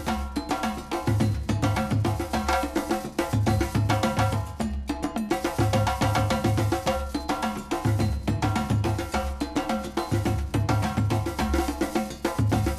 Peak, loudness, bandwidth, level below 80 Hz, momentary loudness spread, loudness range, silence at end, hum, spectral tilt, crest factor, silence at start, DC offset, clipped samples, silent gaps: -10 dBFS; -26 LUFS; 14.5 kHz; -36 dBFS; 5 LU; 1 LU; 0 s; none; -6 dB/octave; 14 dB; 0 s; under 0.1%; under 0.1%; none